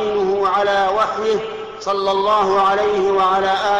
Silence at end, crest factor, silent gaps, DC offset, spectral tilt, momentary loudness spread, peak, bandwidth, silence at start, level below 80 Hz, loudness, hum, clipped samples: 0 s; 10 dB; none; under 0.1%; -4 dB/octave; 7 LU; -8 dBFS; 8.8 kHz; 0 s; -50 dBFS; -17 LUFS; none; under 0.1%